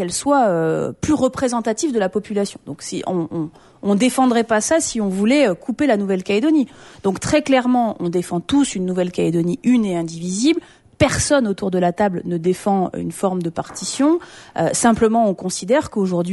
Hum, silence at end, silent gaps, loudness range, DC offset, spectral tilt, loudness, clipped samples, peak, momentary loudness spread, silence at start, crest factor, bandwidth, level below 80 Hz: none; 0 s; none; 2 LU; under 0.1%; -5 dB/octave; -19 LUFS; under 0.1%; -2 dBFS; 8 LU; 0 s; 16 dB; 11.5 kHz; -46 dBFS